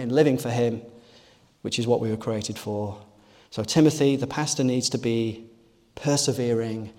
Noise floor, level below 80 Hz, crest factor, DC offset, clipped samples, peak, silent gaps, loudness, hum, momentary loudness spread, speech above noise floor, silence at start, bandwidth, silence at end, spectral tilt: -55 dBFS; -62 dBFS; 18 dB; under 0.1%; under 0.1%; -6 dBFS; none; -24 LUFS; none; 14 LU; 32 dB; 0 s; 16.5 kHz; 0.1 s; -5 dB/octave